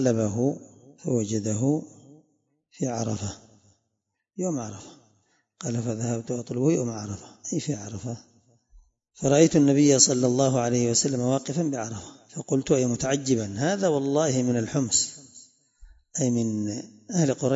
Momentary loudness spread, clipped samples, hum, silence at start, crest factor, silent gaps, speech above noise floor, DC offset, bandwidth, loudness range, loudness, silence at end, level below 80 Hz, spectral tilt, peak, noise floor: 18 LU; under 0.1%; none; 0 s; 22 dB; none; 55 dB; under 0.1%; 8 kHz; 12 LU; -25 LUFS; 0 s; -60 dBFS; -5 dB/octave; -4 dBFS; -80 dBFS